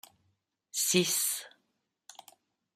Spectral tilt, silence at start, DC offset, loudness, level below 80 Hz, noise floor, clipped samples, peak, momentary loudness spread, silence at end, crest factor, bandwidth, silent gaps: -2 dB/octave; 0.75 s; under 0.1%; -29 LUFS; -80 dBFS; -80 dBFS; under 0.1%; -12 dBFS; 12 LU; 1.25 s; 24 dB; 15.5 kHz; none